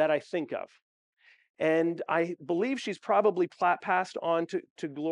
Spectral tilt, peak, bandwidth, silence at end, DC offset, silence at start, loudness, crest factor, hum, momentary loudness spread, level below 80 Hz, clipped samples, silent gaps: -6 dB/octave; -12 dBFS; 10.5 kHz; 0 s; under 0.1%; 0 s; -29 LUFS; 16 dB; none; 10 LU; -88 dBFS; under 0.1%; 0.82-1.13 s, 1.50-1.54 s, 4.70-4.76 s